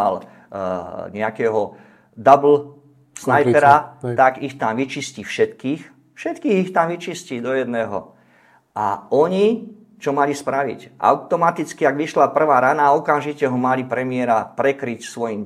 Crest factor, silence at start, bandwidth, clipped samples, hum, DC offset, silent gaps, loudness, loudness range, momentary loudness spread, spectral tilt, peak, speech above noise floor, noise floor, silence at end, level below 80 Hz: 20 dB; 0 s; 14 kHz; under 0.1%; none; under 0.1%; none; -19 LUFS; 6 LU; 14 LU; -6 dB/octave; 0 dBFS; 36 dB; -54 dBFS; 0 s; -66 dBFS